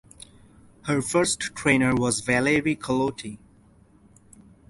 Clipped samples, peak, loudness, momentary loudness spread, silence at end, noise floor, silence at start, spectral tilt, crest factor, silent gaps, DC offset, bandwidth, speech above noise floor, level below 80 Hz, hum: under 0.1%; -6 dBFS; -23 LUFS; 11 LU; 1.35 s; -56 dBFS; 0.85 s; -4.5 dB/octave; 20 dB; none; under 0.1%; 11.5 kHz; 32 dB; -52 dBFS; none